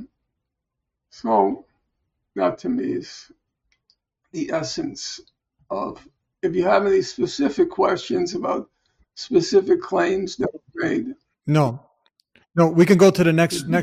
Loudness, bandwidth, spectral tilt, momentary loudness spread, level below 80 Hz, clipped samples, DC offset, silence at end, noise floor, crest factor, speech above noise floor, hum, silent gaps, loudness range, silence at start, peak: -21 LUFS; 15 kHz; -6 dB/octave; 16 LU; -58 dBFS; under 0.1%; under 0.1%; 0 s; -81 dBFS; 20 dB; 61 dB; none; none; 9 LU; 0 s; -2 dBFS